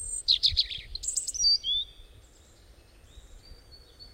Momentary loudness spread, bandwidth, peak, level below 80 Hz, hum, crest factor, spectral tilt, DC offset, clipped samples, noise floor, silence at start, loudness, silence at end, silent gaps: 10 LU; 16 kHz; -12 dBFS; -48 dBFS; none; 20 dB; 1.5 dB/octave; under 0.1%; under 0.1%; -55 dBFS; 0 s; -25 LUFS; 0.05 s; none